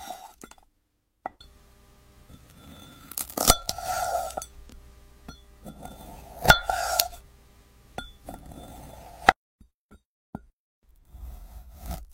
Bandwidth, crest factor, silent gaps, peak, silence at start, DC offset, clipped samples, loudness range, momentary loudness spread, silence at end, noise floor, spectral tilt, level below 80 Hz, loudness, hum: 16.5 kHz; 32 dB; 9.36-9.59 s, 9.74-9.89 s, 10.05-10.33 s, 10.53-10.82 s; 0 dBFS; 0 s; under 0.1%; under 0.1%; 4 LU; 27 LU; 0.05 s; -73 dBFS; -2 dB/octave; -44 dBFS; -24 LUFS; none